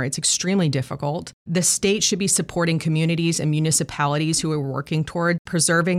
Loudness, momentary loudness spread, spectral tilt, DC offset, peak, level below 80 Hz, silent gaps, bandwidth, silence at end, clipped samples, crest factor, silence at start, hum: -21 LUFS; 7 LU; -4 dB/octave; under 0.1%; -6 dBFS; -52 dBFS; 1.33-1.45 s, 5.39-5.45 s; 15 kHz; 0 s; under 0.1%; 16 dB; 0 s; none